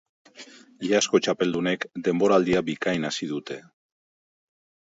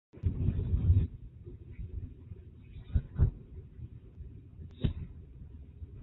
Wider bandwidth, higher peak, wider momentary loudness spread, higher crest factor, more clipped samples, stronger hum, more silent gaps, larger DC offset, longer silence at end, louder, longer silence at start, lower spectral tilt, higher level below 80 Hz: first, 8 kHz vs 4.1 kHz; first, -6 dBFS vs -14 dBFS; second, 17 LU vs 21 LU; about the same, 20 dB vs 22 dB; neither; neither; neither; neither; first, 1.3 s vs 0 s; first, -24 LUFS vs -34 LUFS; first, 0.4 s vs 0.15 s; second, -4.5 dB/octave vs -11.5 dB/octave; second, -60 dBFS vs -38 dBFS